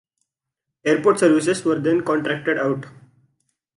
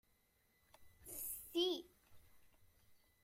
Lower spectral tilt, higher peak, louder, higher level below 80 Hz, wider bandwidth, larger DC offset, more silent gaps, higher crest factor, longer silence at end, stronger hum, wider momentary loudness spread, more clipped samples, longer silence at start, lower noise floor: first, -5.5 dB/octave vs -2 dB/octave; first, -4 dBFS vs -28 dBFS; first, -20 LUFS vs -43 LUFS; first, -66 dBFS vs -76 dBFS; second, 11.5 kHz vs 16.5 kHz; neither; neither; about the same, 18 dB vs 20 dB; first, 0.9 s vs 0.25 s; neither; second, 8 LU vs 13 LU; neither; about the same, 0.85 s vs 0.8 s; first, -83 dBFS vs -78 dBFS